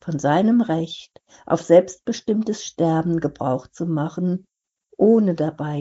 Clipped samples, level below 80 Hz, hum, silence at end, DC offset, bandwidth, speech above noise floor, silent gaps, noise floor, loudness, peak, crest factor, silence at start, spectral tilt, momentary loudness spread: under 0.1%; -60 dBFS; none; 0 s; under 0.1%; 8 kHz; 39 dB; none; -59 dBFS; -21 LUFS; -2 dBFS; 18 dB; 0.05 s; -7 dB/octave; 11 LU